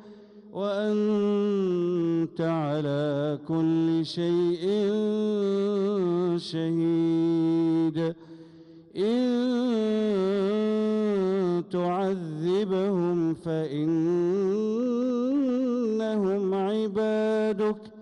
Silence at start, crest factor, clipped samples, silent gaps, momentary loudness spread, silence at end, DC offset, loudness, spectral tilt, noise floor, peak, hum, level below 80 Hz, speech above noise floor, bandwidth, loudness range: 0 s; 8 dB; under 0.1%; none; 4 LU; 0 s; under 0.1%; -26 LUFS; -8 dB/octave; -50 dBFS; -18 dBFS; none; -70 dBFS; 24 dB; 10 kHz; 1 LU